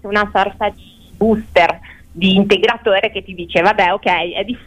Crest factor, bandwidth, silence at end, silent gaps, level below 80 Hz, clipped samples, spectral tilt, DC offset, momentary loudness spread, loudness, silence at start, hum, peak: 14 dB; 10.5 kHz; 0.05 s; none; -40 dBFS; under 0.1%; -6 dB/octave; under 0.1%; 9 LU; -15 LUFS; 0.05 s; none; -2 dBFS